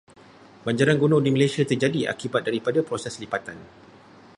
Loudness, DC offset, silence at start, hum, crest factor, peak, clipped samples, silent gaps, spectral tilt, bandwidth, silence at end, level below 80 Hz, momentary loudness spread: -23 LUFS; under 0.1%; 0.65 s; none; 20 dB; -4 dBFS; under 0.1%; none; -6 dB/octave; 11.5 kHz; 0.7 s; -62 dBFS; 11 LU